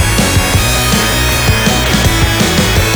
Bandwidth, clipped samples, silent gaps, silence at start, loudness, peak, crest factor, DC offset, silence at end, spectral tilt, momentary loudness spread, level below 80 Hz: over 20 kHz; under 0.1%; none; 0 s; -10 LUFS; 0 dBFS; 10 dB; under 0.1%; 0 s; -3.5 dB/octave; 0 LU; -18 dBFS